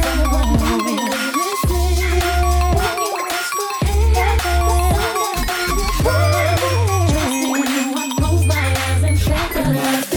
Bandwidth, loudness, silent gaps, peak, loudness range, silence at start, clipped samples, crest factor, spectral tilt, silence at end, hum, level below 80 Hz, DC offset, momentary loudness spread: 19 kHz; -17 LUFS; none; -4 dBFS; 1 LU; 0 s; under 0.1%; 12 dB; -5 dB/octave; 0 s; none; -22 dBFS; under 0.1%; 3 LU